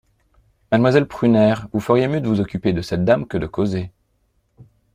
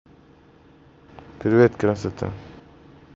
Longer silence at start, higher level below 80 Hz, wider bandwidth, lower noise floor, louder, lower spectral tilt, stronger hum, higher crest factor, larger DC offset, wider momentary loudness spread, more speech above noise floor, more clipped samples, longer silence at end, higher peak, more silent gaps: second, 0.7 s vs 1.4 s; first, -48 dBFS vs -54 dBFS; first, 14 kHz vs 7.8 kHz; first, -65 dBFS vs -52 dBFS; about the same, -19 LUFS vs -21 LUFS; about the same, -8 dB/octave vs -7.5 dB/octave; neither; about the same, 18 dB vs 22 dB; neither; second, 8 LU vs 15 LU; first, 47 dB vs 32 dB; neither; second, 0.3 s vs 0.65 s; about the same, -2 dBFS vs -4 dBFS; neither